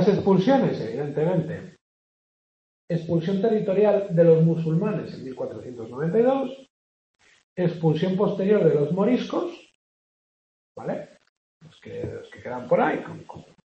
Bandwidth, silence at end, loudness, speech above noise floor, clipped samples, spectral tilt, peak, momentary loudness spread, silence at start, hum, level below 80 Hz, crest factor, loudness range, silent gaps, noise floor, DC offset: 7.4 kHz; 0.25 s; -23 LUFS; over 67 dB; under 0.1%; -9 dB/octave; -6 dBFS; 16 LU; 0 s; none; -66 dBFS; 18 dB; 8 LU; 1.81-2.88 s, 6.70-7.14 s, 7.43-7.56 s, 9.75-10.75 s, 11.29-11.61 s; under -90 dBFS; under 0.1%